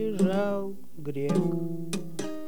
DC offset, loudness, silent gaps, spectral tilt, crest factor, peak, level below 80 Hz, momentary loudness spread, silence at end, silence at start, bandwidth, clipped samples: 2%; -30 LUFS; none; -7 dB/octave; 16 dB; -12 dBFS; -68 dBFS; 11 LU; 0 s; 0 s; 20 kHz; under 0.1%